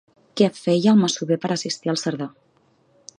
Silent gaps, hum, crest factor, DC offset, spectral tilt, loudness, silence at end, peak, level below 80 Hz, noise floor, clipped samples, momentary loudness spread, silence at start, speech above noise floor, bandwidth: none; none; 18 dB; under 0.1%; -5.5 dB/octave; -21 LUFS; 0.9 s; -4 dBFS; -70 dBFS; -61 dBFS; under 0.1%; 14 LU; 0.35 s; 41 dB; 10 kHz